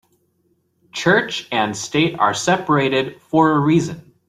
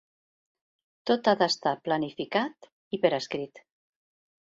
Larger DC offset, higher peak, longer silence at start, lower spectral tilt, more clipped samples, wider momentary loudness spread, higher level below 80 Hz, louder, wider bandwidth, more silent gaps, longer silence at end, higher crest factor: neither; first, -2 dBFS vs -8 dBFS; about the same, 0.95 s vs 1.05 s; about the same, -5 dB/octave vs -4.5 dB/octave; neither; second, 6 LU vs 12 LU; first, -56 dBFS vs -72 dBFS; first, -18 LUFS vs -28 LUFS; first, 14 kHz vs 7.8 kHz; second, none vs 2.72-2.91 s; second, 0.3 s vs 0.95 s; about the same, 18 dB vs 22 dB